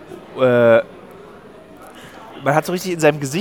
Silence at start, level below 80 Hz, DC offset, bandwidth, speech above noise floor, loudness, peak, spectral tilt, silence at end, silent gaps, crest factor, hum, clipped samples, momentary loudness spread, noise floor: 0 s; -60 dBFS; 0.1%; 17.5 kHz; 26 dB; -16 LUFS; 0 dBFS; -5.5 dB/octave; 0 s; none; 18 dB; none; under 0.1%; 25 LU; -41 dBFS